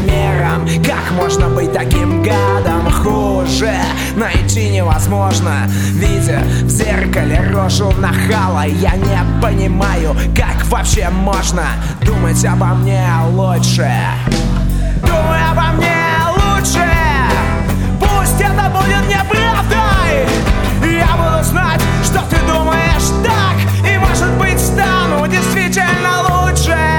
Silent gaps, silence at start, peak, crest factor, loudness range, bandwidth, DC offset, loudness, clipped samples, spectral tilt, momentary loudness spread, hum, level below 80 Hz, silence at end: none; 0 s; 0 dBFS; 12 dB; 1 LU; 19.5 kHz; under 0.1%; -13 LUFS; under 0.1%; -5 dB/octave; 3 LU; none; -18 dBFS; 0 s